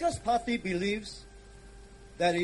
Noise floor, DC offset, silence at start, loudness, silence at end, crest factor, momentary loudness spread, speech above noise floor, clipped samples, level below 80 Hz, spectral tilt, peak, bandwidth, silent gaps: -50 dBFS; under 0.1%; 0 s; -31 LUFS; 0 s; 16 dB; 23 LU; 20 dB; under 0.1%; -52 dBFS; -5 dB/octave; -14 dBFS; 11.5 kHz; none